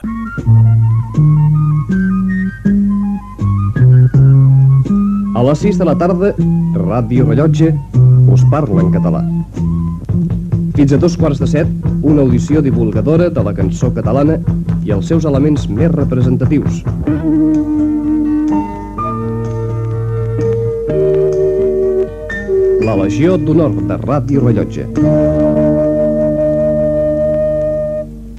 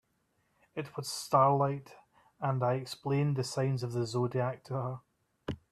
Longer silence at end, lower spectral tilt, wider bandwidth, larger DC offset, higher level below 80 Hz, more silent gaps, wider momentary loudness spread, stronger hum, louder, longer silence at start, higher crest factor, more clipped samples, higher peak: second, 0 s vs 0.15 s; first, -9.5 dB/octave vs -6 dB/octave; second, 8 kHz vs 13.5 kHz; neither; first, -28 dBFS vs -68 dBFS; neither; second, 8 LU vs 16 LU; neither; first, -13 LUFS vs -32 LUFS; second, 0 s vs 0.75 s; second, 12 dB vs 20 dB; neither; first, 0 dBFS vs -12 dBFS